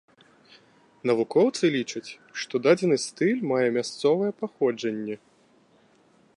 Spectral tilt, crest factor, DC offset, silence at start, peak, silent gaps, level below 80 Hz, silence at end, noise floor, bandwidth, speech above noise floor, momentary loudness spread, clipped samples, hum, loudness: -5 dB/octave; 20 dB; under 0.1%; 1.05 s; -6 dBFS; none; -76 dBFS; 1.2 s; -60 dBFS; 11 kHz; 36 dB; 13 LU; under 0.1%; none; -25 LUFS